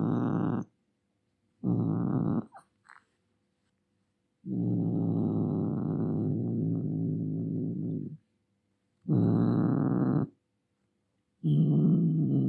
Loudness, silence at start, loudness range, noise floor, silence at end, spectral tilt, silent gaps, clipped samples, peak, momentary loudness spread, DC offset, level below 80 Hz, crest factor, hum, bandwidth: -30 LUFS; 0 s; 6 LU; -77 dBFS; 0 s; -12 dB/octave; none; under 0.1%; -16 dBFS; 11 LU; under 0.1%; -68 dBFS; 14 dB; none; 4.2 kHz